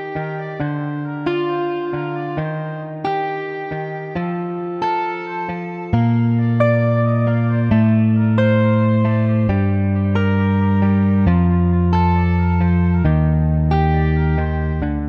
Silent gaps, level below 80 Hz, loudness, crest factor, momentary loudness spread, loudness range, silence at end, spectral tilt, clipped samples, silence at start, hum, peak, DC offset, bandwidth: none; -30 dBFS; -18 LUFS; 14 dB; 10 LU; 7 LU; 0 s; -10.5 dB/octave; under 0.1%; 0 s; none; -2 dBFS; under 0.1%; 5.8 kHz